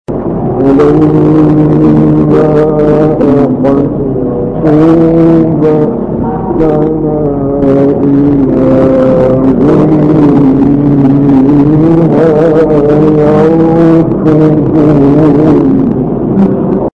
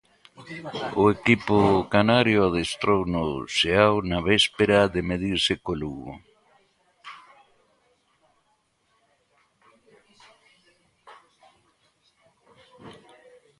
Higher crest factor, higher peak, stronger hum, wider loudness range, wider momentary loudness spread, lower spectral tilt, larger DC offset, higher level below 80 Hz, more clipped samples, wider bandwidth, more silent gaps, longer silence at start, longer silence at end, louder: second, 6 dB vs 24 dB; about the same, 0 dBFS vs -2 dBFS; neither; second, 2 LU vs 10 LU; second, 6 LU vs 19 LU; first, -10.5 dB/octave vs -5 dB/octave; neither; first, -28 dBFS vs -48 dBFS; neither; second, 5.8 kHz vs 11.5 kHz; neither; second, 0.1 s vs 0.4 s; second, 0.05 s vs 0.7 s; first, -7 LUFS vs -22 LUFS